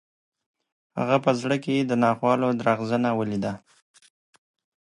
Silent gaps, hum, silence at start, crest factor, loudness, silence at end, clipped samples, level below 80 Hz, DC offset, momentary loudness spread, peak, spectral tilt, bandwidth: none; none; 0.95 s; 20 dB; -24 LUFS; 1.3 s; under 0.1%; -66 dBFS; under 0.1%; 9 LU; -6 dBFS; -6.5 dB/octave; 11 kHz